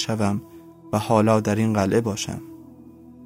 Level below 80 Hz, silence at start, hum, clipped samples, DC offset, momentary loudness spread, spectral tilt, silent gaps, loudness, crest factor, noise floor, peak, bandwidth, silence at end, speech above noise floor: -56 dBFS; 0 s; none; under 0.1%; under 0.1%; 12 LU; -6 dB/octave; none; -22 LUFS; 18 dB; -45 dBFS; -4 dBFS; 16 kHz; 0 s; 24 dB